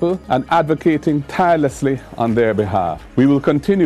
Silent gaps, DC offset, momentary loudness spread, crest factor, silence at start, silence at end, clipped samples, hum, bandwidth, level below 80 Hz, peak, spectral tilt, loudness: none; under 0.1%; 6 LU; 12 dB; 0 s; 0 s; under 0.1%; none; 13 kHz; -42 dBFS; -4 dBFS; -7.5 dB/octave; -17 LUFS